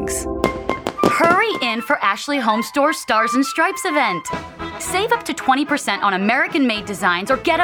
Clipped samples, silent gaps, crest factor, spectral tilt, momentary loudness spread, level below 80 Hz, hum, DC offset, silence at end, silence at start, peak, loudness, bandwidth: under 0.1%; none; 18 dB; -3.5 dB/octave; 7 LU; -44 dBFS; none; under 0.1%; 0 s; 0 s; 0 dBFS; -18 LUFS; over 20 kHz